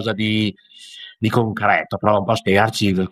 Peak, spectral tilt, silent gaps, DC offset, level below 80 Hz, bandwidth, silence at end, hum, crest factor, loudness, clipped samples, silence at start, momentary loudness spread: -2 dBFS; -6 dB/octave; none; under 0.1%; -52 dBFS; 15 kHz; 0.05 s; none; 18 dB; -18 LUFS; under 0.1%; 0 s; 13 LU